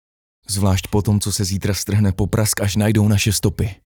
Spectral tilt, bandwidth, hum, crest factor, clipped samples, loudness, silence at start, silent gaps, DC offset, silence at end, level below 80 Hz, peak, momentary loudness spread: -5 dB/octave; over 20 kHz; none; 14 dB; under 0.1%; -19 LUFS; 0.5 s; none; under 0.1%; 0.2 s; -38 dBFS; -4 dBFS; 5 LU